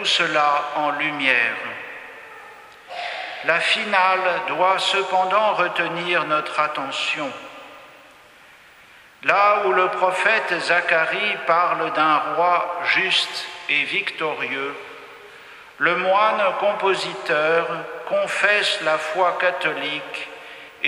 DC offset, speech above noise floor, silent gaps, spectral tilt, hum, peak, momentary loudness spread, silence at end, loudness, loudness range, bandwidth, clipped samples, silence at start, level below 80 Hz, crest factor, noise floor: under 0.1%; 28 dB; none; -2.5 dB/octave; none; -2 dBFS; 14 LU; 0 s; -20 LUFS; 4 LU; 13.5 kHz; under 0.1%; 0 s; -70 dBFS; 20 dB; -48 dBFS